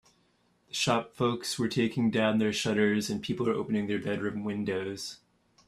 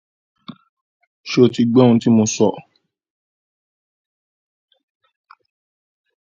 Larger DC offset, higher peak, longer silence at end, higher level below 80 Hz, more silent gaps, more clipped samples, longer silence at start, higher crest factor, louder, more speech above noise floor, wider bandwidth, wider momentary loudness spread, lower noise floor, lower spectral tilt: neither; second, -10 dBFS vs 0 dBFS; second, 0.5 s vs 3.8 s; about the same, -66 dBFS vs -62 dBFS; second, none vs 0.69-1.00 s, 1.07-1.24 s; neither; first, 0.75 s vs 0.5 s; about the same, 20 dB vs 20 dB; second, -30 LUFS vs -15 LUFS; second, 40 dB vs over 76 dB; first, 14 kHz vs 7.6 kHz; second, 7 LU vs 15 LU; second, -69 dBFS vs under -90 dBFS; about the same, -5 dB/octave vs -6 dB/octave